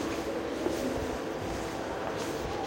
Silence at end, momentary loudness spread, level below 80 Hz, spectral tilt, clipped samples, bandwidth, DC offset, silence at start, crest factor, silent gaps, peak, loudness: 0 s; 3 LU; -48 dBFS; -5 dB/octave; under 0.1%; 16 kHz; under 0.1%; 0 s; 16 dB; none; -16 dBFS; -34 LUFS